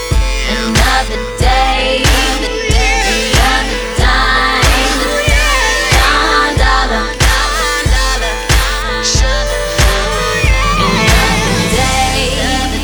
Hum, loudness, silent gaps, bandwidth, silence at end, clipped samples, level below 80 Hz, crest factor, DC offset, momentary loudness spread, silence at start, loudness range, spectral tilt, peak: none; -11 LUFS; none; over 20 kHz; 0 s; under 0.1%; -16 dBFS; 12 dB; under 0.1%; 5 LU; 0 s; 2 LU; -3 dB/octave; 0 dBFS